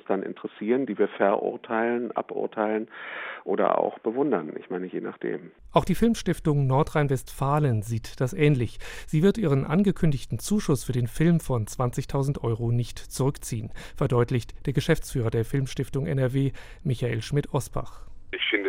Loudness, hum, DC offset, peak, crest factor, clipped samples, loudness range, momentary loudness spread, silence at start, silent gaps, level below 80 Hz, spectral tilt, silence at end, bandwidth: -26 LUFS; none; under 0.1%; -6 dBFS; 20 dB; under 0.1%; 3 LU; 11 LU; 0.1 s; none; -44 dBFS; -6.5 dB/octave; 0 s; 16 kHz